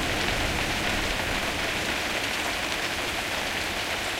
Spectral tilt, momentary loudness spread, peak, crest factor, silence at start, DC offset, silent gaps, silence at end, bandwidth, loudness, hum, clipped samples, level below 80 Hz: -2.5 dB/octave; 2 LU; -12 dBFS; 16 dB; 0 s; under 0.1%; none; 0 s; 16 kHz; -26 LUFS; none; under 0.1%; -40 dBFS